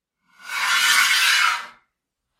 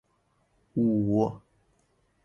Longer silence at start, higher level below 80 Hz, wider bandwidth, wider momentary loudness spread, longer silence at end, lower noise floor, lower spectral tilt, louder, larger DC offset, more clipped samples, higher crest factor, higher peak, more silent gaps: second, 0.45 s vs 0.75 s; second, -76 dBFS vs -60 dBFS; first, 16.5 kHz vs 6.8 kHz; about the same, 12 LU vs 12 LU; second, 0.7 s vs 0.85 s; first, -79 dBFS vs -71 dBFS; second, 4.5 dB/octave vs -10.5 dB/octave; first, -17 LUFS vs -27 LUFS; neither; neither; about the same, 18 dB vs 16 dB; first, -4 dBFS vs -14 dBFS; neither